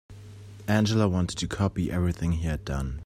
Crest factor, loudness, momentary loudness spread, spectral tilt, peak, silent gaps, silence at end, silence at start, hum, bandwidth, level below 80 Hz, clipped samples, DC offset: 18 dB; -27 LUFS; 18 LU; -6 dB/octave; -10 dBFS; none; 0 s; 0.1 s; none; 15 kHz; -40 dBFS; under 0.1%; under 0.1%